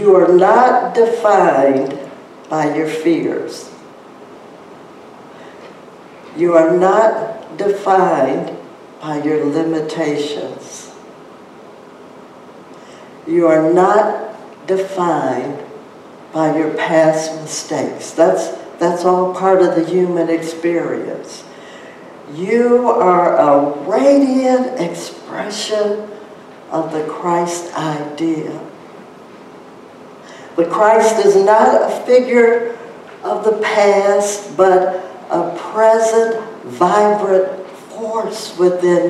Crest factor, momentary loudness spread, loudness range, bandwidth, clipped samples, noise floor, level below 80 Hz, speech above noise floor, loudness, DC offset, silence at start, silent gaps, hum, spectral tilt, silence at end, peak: 14 dB; 19 LU; 9 LU; 13 kHz; under 0.1%; -38 dBFS; -64 dBFS; 24 dB; -14 LUFS; under 0.1%; 0 s; none; none; -5 dB/octave; 0 s; 0 dBFS